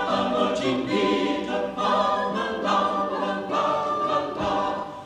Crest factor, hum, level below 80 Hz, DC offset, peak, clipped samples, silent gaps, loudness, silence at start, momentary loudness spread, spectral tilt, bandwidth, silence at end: 14 dB; none; -54 dBFS; under 0.1%; -10 dBFS; under 0.1%; none; -24 LUFS; 0 s; 4 LU; -5 dB/octave; 11.5 kHz; 0 s